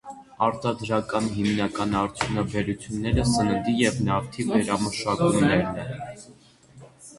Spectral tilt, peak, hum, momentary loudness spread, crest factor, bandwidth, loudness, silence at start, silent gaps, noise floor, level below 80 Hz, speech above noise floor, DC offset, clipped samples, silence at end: -5.5 dB/octave; -8 dBFS; none; 8 LU; 18 dB; 11.5 kHz; -25 LUFS; 0.05 s; none; -50 dBFS; -44 dBFS; 26 dB; under 0.1%; under 0.1%; 0 s